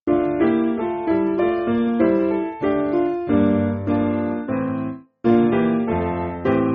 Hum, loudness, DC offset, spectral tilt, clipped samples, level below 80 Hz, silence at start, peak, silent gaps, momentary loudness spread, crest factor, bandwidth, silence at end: none; -20 LUFS; under 0.1%; -7.5 dB/octave; under 0.1%; -48 dBFS; 0.05 s; -4 dBFS; none; 6 LU; 16 dB; 4.5 kHz; 0 s